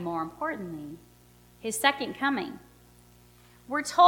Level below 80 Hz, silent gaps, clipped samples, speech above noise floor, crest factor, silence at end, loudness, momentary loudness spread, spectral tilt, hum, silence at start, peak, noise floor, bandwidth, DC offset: -64 dBFS; none; under 0.1%; 30 dB; 24 dB; 0 s; -30 LUFS; 18 LU; -3 dB/octave; 60 Hz at -55 dBFS; 0 s; -6 dBFS; -57 dBFS; 19 kHz; under 0.1%